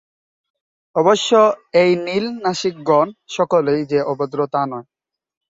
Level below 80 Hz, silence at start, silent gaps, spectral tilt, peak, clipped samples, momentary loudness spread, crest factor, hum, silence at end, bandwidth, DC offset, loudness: -62 dBFS; 0.95 s; none; -5 dB/octave; -2 dBFS; under 0.1%; 9 LU; 16 dB; none; 0.65 s; 7.8 kHz; under 0.1%; -18 LUFS